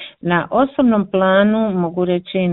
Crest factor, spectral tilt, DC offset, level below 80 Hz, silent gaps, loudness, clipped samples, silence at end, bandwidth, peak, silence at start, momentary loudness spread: 16 dB; -12 dB/octave; under 0.1%; -52 dBFS; none; -16 LUFS; under 0.1%; 0 s; 4.1 kHz; 0 dBFS; 0 s; 6 LU